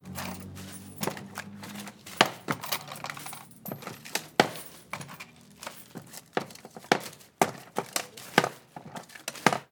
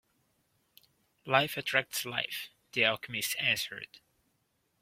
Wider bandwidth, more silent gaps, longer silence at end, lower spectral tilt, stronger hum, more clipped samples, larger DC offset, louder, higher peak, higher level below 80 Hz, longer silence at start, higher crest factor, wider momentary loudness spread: first, over 20 kHz vs 16.5 kHz; neither; second, 0.05 s vs 0.85 s; about the same, -3 dB/octave vs -2 dB/octave; neither; neither; neither; about the same, -32 LUFS vs -31 LUFS; first, -2 dBFS vs -8 dBFS; about the same, -74 dBFS vs -74 dBFS; second, 0.05 s vs 1.25 s; first, 32 dB vs 26 dB; first, 17 LU vs 13 LU